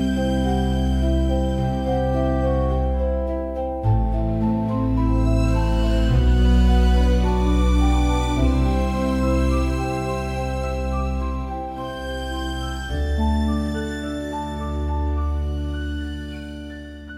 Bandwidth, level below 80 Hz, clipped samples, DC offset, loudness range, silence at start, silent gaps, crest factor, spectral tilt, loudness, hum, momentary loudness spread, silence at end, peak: 11.5 kHz; -22 dBFS; under 0.1%; under 0.1%; 7 LU; 0 s; none; 12 dB; -7.5 dB/octave; -22 LUFS; none; 9 LU; 0 s; -8 dBFS